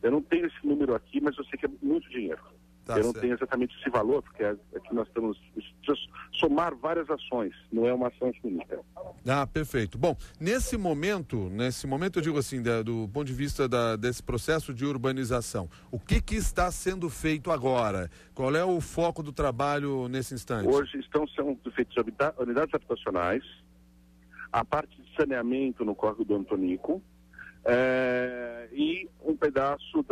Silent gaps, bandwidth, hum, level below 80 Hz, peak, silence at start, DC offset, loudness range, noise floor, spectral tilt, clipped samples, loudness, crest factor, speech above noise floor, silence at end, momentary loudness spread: none; 15 kHz; none; -44 dBFS; -12 dBFS; 0.05 s; under 0.1%; 2 LU; -57 dBFS; -5.5 dB/octave; under 0.1%; -30 LUFS; 16 dB; 29 dB; 0.05 s; 8 LU